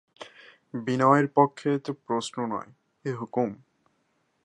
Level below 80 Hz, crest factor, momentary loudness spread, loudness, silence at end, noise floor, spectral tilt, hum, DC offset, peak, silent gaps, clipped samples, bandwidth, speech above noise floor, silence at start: -76 dBFS; 22 dB; 18 LU; -26 LUFS; 0.9 s; -72 dBFS; -6.5 dB/octave; none; under 0.1%; -6 dBFS; none; under 0.1%; 11 kHz; 46 dB; 0.2 s